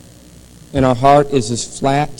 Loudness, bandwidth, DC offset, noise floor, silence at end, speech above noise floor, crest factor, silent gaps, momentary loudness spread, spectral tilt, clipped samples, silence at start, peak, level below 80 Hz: -15 LUFS; 17 kHz; under 0.1%; -41 dBFS; 0.05 s; 27 dB; 16 dB; none; 10 LU; -5.5 dB/octave; 0.1%; 0.75 s; 0 dBFS; -36 dBFS